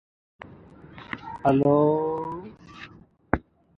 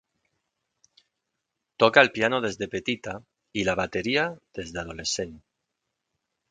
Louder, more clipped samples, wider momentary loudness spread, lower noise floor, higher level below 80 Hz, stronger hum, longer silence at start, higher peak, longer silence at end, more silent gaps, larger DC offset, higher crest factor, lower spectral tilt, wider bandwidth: about the same, -24 LUFS vs -25 LUFS; neither; first, 25 LU vs 17 LU; second, -49 dBFS vs -82 dBFS; first, -50 dBFS vs -56 dBFS; neither; second, 0.5 s vs 1.8 s; about the same, 0 dBFS vs 0 dBFS; second, 0.4 s vs 1.15 s; neither; neither; about the same, 26 dB vs 28 dB; first, -9.5 dB/octave vs -3.5 dB/octave; second, 6.4 kHz vs 9.6 kHz